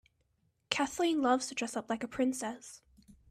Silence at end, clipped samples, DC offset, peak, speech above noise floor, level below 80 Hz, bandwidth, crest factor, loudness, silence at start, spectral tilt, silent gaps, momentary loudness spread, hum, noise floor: 0.2 s; under 0.1%; under 0.1%; -10 dBFS; 43 dB; -70 dBFS; 14 kHz; 26 dB; -33 LUFS; 0.7 s; -2.5 dB/octave; none; 11 LU; none; -76 dBFS